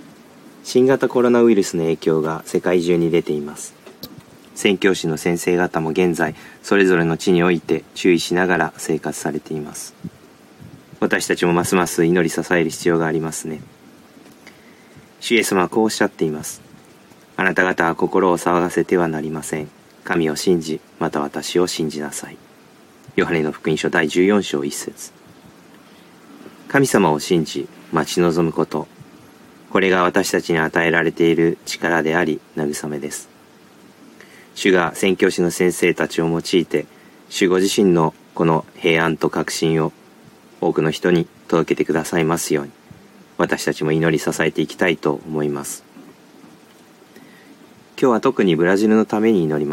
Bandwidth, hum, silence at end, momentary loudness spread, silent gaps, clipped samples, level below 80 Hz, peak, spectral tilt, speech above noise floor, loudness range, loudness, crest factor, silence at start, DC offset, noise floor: 16.5 kHz; none; 0 s; 13 LU; none; under 0.1%; -56 dBFS; 0 dBFS; -5 dB/octave; 29 dB; 4 LU; -19 LUFS; 20 dB; 0.45 s; under 0.1%; -47 dBFS